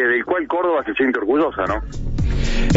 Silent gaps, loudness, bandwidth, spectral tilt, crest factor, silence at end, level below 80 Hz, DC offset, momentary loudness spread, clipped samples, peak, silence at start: none; -20 LUFS; 8 kHz; -6.5 dB/octave; 16 dB; 0 s; -24 dBFS; under 0.1%; 6 LU; under 0.1%; -2 dBFS; 0 s